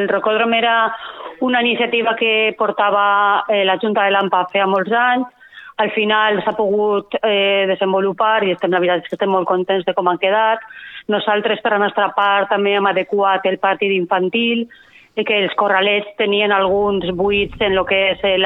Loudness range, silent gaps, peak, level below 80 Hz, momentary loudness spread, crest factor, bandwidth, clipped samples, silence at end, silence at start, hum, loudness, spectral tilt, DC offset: 2 LU; none; -2 dBFS; -50 dBFS; 5 LU; 16 dB; 4.1 kHz; under 0.1%; 0 s; 0 s; none; -16 LUFS; -7 dB/octave; under 0.1%